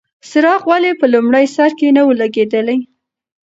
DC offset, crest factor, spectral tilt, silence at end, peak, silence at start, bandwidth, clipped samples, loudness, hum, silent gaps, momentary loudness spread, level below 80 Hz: under 0.1%; 12 dB; -5 dB/octave; 0.6 s; 0 dBFS; 0.25 s; 8 kHz; under 0.1%; -13 LUFS; none; none; 6 LU; -64 dBFS